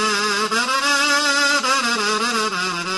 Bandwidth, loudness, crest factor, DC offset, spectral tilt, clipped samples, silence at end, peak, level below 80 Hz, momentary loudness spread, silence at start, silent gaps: 12 kHz; -17 LUFS; 14 dB; under 0.1%; -1 dB/octave; under 0.1%; 0 s; -4 dBFS; -64 dBFS; 4 LU; 0 s; none